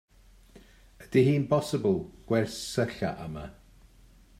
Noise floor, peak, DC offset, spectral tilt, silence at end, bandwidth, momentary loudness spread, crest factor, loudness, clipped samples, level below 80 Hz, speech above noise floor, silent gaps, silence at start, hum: -56 dBFS; -10 dBFS; under 0.1%; -6.5 dB/octave; 0.9 s; 15.5 kHz; 15 LU; 20 dB; -28 LUFS; under 0.1%; -56 dBFS; 29 dB; none; 0.55 s; none